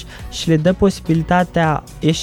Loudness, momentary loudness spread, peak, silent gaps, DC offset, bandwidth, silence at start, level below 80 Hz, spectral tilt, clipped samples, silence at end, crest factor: -17 LUFS; 5 LU; -4 dBFS; none; under 0.1%; 14 kHz; 0 s; -36 dBFS; -6 dB/octave; under 0.1%; 0 s; 14 dB